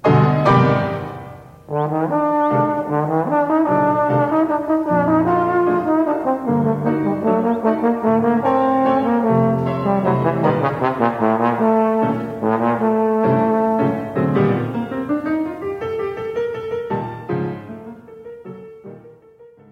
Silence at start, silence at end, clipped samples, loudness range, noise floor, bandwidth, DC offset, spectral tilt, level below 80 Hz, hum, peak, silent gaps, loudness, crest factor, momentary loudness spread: 0.05 s; 0.25 s; under 0.1%; 7 LU; -46 dBFS; 7.8 kHz; under 0.1%; -9.5 dB/octave; -52 dBFS; none; -2 dBFS; none; -18 LUFS; 16 dB; 10 LU